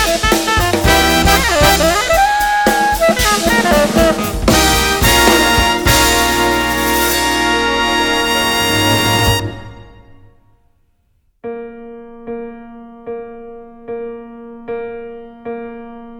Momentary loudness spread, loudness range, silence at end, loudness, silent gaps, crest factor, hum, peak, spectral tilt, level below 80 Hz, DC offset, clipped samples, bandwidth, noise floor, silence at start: 21 LU; 20 LU; 0 s; -12 LUFS; none; 14 dB; none; 0 dBFS; -3 dB/octave; -26 dBFS; under 0.1%; under 0.1%; over 20 kHz; -58 dBFS; 0 s